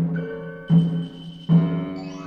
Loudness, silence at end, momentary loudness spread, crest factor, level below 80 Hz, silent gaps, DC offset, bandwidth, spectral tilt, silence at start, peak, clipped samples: -22 LUFS; 0 s; 15 LU; 16 dB; -56 dBFS; none; under 0.1%; 5.8 kHz; -9.5 dB/octave; 0 s; -6 dBFS; under 0.1%